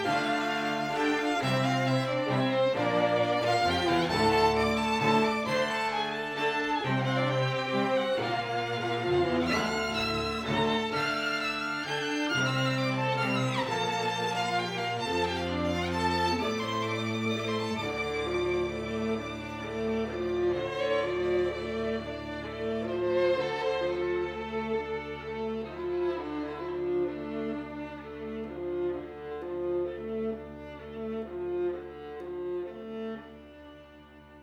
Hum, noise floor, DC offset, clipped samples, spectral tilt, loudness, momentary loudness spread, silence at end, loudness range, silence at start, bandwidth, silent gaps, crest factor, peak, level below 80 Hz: none; -52 dBFS; under 0.1%; under 0.1%; -5.5 dB/octave; -30 LUFS; 11 LU; 0 s; 9 LU; 0 s; 17 kHz; none; 18 dB; -12 dBFS; -54 dBFS